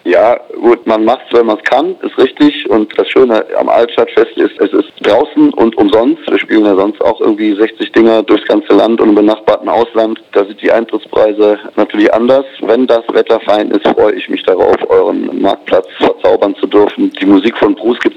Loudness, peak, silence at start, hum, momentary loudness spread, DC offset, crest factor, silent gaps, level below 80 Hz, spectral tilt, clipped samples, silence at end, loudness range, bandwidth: -10 LUFS; 0 dBFS; 0.05 s; none; 4 LU; under 0.1%; 10 dB; none; -48 dBFS; -6.5 dB/octave; under 0.1%; 0.05 s; 1 LU; 7.6 kHz